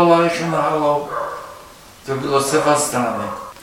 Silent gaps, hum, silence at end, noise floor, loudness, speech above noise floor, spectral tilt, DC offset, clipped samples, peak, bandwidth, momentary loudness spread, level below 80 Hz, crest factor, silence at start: none; none; 0 s; -41 dBFS; -18 LUFS; 24 dB; -4.5 dB/octave; under 0.1%; under 0.1%; 0 dBFS; 16.5 kHz; 17 LU; -52 dBFS; 18 dB; 0 s